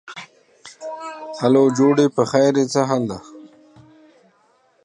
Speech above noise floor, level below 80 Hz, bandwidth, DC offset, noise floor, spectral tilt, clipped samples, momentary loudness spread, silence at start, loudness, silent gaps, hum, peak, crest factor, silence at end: 42 dB; -64 dBFS; 10.5 kHz; under 0.1%; -59 dBFS; -6 dB/octave; under 0.1%; 19 LU; 0.05 s; -17 LUFS; none; none; -2 dBFS; 18 dB; 1.4 s